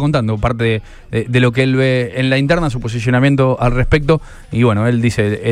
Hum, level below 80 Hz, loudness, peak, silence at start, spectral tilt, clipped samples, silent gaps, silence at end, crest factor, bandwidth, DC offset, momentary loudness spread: none; -28 dBFS; -15 LUFS; 0 dBFS; 0 s; -7 dB/octave; under 0.1%; none; 0 s; 14 dB; 11 kHz; under 0.1%; 6 LU